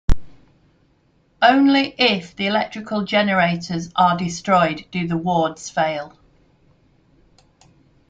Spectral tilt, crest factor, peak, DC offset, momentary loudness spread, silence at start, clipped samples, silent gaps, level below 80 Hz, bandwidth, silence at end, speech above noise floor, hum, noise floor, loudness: -5 dB/octave; 20 dB; -2 dBFS; under 0.1%; 10 LU; 0.1 s; under 0.1%; none; -34 dBFS; 9 kHz; 2 s; 41 dB; none; -60 dBFS; -19 LUFS